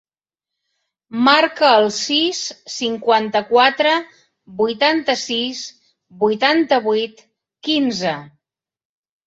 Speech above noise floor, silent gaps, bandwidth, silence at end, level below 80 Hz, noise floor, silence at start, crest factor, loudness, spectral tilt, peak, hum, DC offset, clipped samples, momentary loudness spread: 70 dB; none; 8 kHz; 1 s; -66 dBFS; -87 dBFS; 1.1 s; 18 dB; -17 LUFS; -3 dB/octave; -2 dBFS; none; under 0.1%; under 0.1%; 14 LU